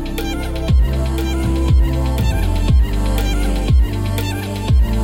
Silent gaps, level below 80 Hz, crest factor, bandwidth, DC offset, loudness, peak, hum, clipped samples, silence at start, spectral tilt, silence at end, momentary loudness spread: none; -16 dBFS; 12 dB; 17 kHz; under 0.1%; -18 LUFS; -4 dBFS; none; under 0.1%; 0 s; -6.5 dB/octave; 0 s; 6 LU